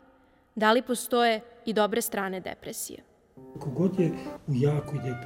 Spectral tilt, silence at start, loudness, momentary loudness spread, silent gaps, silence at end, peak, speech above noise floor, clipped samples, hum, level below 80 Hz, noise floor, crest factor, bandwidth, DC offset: -5 dB/octave; 0.55 s; -28 LUFS; 14 LU; none; 0 s; -10 dBFS; 33 dB; under 0.1%; none; -62 dBFS; -61 dBFS; 20 dB; 18 kHz; under 0.1%